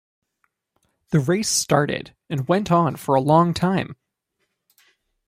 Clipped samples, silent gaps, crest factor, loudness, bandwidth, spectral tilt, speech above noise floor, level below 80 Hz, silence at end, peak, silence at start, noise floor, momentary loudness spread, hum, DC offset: under 0.1%; none; 18 dB; -20 LUFS; 16 kHz; -5 dB/octave; 55 dB; -56 dBFS; 1.35 s; -4 dBFS; 1.1 s; -75 dBFS; 11 LU; none; under 0.1%